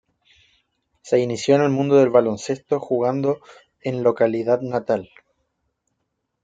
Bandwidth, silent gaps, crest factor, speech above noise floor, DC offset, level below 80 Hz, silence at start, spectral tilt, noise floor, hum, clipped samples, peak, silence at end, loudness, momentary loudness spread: 9.2 kHz; none; 18 dB; 56 dB; under 0.1%; -66 dBFS; 1.05 s; -6.5 dB/octave; -76 dBFS; none; under 0.1%; -4 dBFS; 1.4 s; -20 LUFS; 9 LU